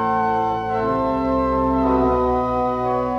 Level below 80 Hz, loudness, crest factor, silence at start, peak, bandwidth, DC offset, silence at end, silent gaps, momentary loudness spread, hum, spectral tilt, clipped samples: -36 dBFS; -20 LUFS; 10 dB; 0 s; -8 dBFS; 6.6 kHz; under 0.1%; 0 s; none; 3 LU; none; -8.5 dB/octave; under 0.1%